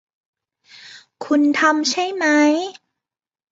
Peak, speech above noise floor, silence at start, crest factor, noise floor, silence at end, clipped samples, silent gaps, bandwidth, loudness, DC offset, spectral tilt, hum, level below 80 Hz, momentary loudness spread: -2 dBFS; 69 dB; 0.85 s; 18 dB; -86 dBFS; 0.8 s; under 0.1%; none; 7.8 kHz; -17 LUFS; under 0.1%; -1.5 dB/octave; none; -72 dBFS; 11 LU